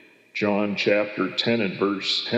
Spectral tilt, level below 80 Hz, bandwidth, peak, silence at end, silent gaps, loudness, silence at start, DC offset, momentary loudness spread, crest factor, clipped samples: -5 dB/octave; -80 dBFS; 8.4 kHz; -8 dBFS; 0 s; none; -23 LUFS; 0.35 s; under 0.1%; 4 LU; 16 dB; under 0.1%